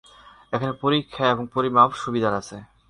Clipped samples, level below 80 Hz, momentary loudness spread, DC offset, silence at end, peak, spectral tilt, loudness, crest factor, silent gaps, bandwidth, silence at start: under 0.1%; -56 dBFS; 12 LU; under 0.1%; 0.25 s; -4 dBFS; -6 dB/octave; -22 LUFS; 20 dB; none; 11 kHz; 0.5 s